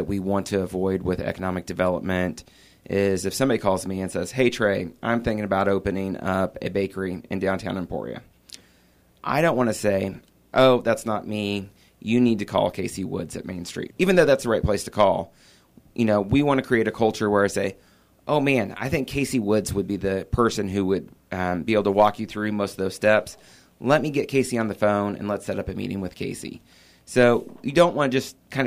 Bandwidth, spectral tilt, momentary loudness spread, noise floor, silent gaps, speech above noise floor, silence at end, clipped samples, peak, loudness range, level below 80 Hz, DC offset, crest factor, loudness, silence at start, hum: 15.5 kHz; -5.5 dB/octave; 12 LU; -58 dBFS; none; 35 dB; 0 s; under 0.1%; -6 dBFS; 4 LU; -48 dBFS; under 0.1%; 18 dB; -23 LUFS; 0 s; none